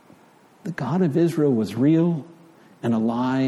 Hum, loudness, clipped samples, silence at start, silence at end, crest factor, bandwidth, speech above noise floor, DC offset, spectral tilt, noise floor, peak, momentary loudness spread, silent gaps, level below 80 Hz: none; -22 LUFS; under 0.1%; 0.65 s; 0 s; 14 dB; 13 kHz; 33 dB; under 0.1%; -8.5 dB/octave; -53 dBFS; -10 dBFS; 11 LU; none; -66 dBFS